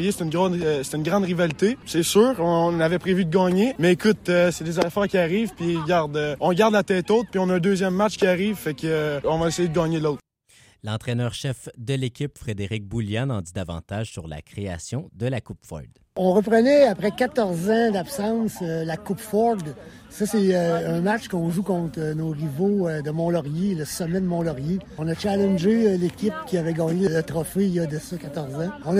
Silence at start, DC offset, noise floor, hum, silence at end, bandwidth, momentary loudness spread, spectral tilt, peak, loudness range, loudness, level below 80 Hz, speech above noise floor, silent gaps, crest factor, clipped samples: 0 s; under 0.1%; -56 dBFS; none; 0 s; 16 kHz; 12 LU; -6 dB/octave; -6 dBFS; 8 LU; -23 LUFS; -52 dBFS; 33 dB; none; 16 dB; under 0.1%